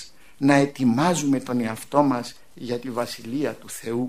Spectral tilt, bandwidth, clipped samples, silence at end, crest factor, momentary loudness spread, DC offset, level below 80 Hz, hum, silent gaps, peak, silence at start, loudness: -5.5 dB/octave; 15.5 kHz; under 0.1%; 0 s; 22 dB; 13 LU; 0.5%; -60 dBFS; none; none; -2 dBFS; 0 s; -23 LUFS